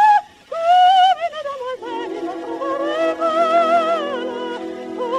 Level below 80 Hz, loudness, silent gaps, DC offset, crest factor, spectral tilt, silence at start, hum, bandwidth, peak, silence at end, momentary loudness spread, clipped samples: -66 dBFS; -18 LUFS; none; under 0.1%; 14 dB; -3 dB/octave; 0 s; none; 11 kHz; -4 dBFS; 0 s; 14 LU; under 0.1%